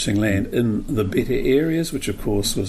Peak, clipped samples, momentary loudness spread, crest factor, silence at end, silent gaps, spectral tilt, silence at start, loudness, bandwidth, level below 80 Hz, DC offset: -6 dBFS; under 0.1%; 5 LU; 14 dB; 0 s; none; -5.5 dB/octave; 0 s; -21 LUFS; 15.5 kHz; -34 dBFS; under 0.1%